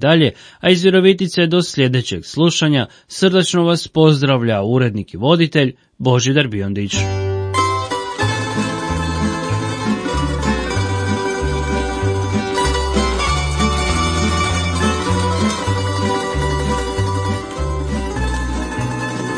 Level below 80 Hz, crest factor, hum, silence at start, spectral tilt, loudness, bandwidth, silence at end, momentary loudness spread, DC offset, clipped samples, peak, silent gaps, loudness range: -28 dBFS; 16 dB; none; 0 s; -5 dB/octave; -17 LUFS; 10.5 kHz; 0 s; 8 LU; under 0.1%; under 0.1%; 0 dBFS; none; 5 LU